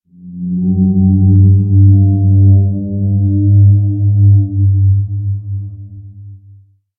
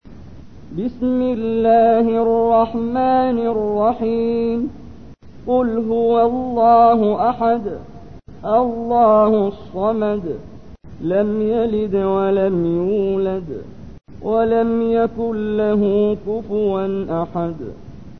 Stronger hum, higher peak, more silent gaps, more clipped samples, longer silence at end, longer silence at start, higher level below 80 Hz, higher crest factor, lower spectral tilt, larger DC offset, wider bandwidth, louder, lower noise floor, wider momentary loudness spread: neither; first, 0 dBFS vs -4 dBFS; neither; neither; first, 0.6 s vs 0.05 s; first, 0.25 s vs 0 s; about the same, -40 dBFS vs -44 dBFS; about the same, 10 dB vs 14 dB; first, -20.5 dB/octave vs -9.5 dB/octave; second, under 0.1% vs 0.9%; second, 0.8 kHz vs 6 kHz; first, -11 LUFS vs -17 LUFS; about the same, -43 dBFS vs -40 dBFS; about the same, 12 LU vs 13 LU